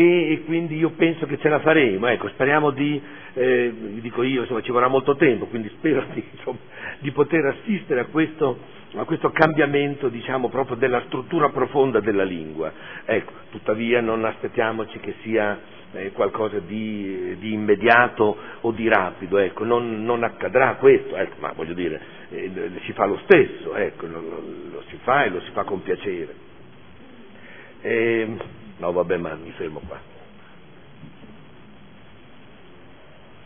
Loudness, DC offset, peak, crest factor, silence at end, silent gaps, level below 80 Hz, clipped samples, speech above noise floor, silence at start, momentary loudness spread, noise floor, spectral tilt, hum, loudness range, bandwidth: -22 LUFS; 0.5%; 0 dBFS; 22 dB; 2.1 s; none; -58 dBFS; under 0.1%; 26 dB; 0 s; 16 LU; -48 dBFS; -9 dB/octave; none; 6 LU; 5.4 kHz